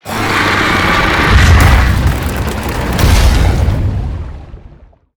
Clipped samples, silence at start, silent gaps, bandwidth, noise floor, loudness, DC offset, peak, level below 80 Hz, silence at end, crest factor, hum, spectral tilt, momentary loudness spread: under 0.1%; 0.05 s; none; over 20 kHz; -40 dBFS; -11 LUFS; under 0.1%; 0 dBFS; -14 dBFS; 0.55 s; 10 dB; none; -5 dB/octave; 12 LU